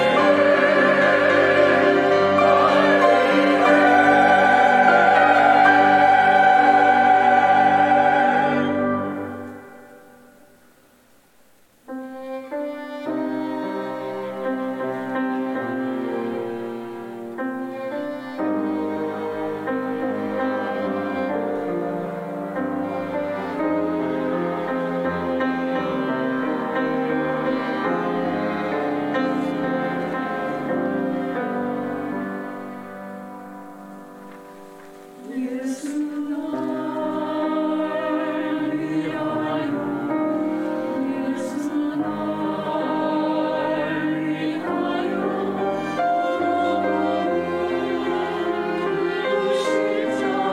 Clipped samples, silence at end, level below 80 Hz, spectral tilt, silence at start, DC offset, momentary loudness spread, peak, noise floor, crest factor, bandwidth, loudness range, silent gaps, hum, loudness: under 0.1%; 0 s; -66 dBFS; -6 dB/octave; 0 s; under 0.1%; 15 LU; -2 dBFS; -57 dBFS; 18 dB; 14.5 kHz; 15 LU; none; none; -21 LUFS